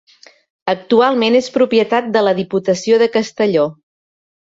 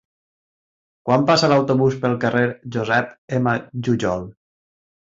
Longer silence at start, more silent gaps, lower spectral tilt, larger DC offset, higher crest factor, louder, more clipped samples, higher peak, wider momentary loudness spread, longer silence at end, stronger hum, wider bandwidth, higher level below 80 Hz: second, 0.65 s vs 1.05 s; second, none vs 3.18-3.28 s; about the same, -5 dB/octave vs -6 dB/octave; neither; about the same, 14 dB vs 18 dB; first, -15 LUFS vs -19 LUFS; neither; about the same, -2 dBFS vs -4 dBFS; second, 7 LU vs 10 LU; about the same, 0.8 s vs 0.8 s; neither; about the same, 7.8 kHz vs 7.8 kHz; second, -60 dBFS vs -54 dBFS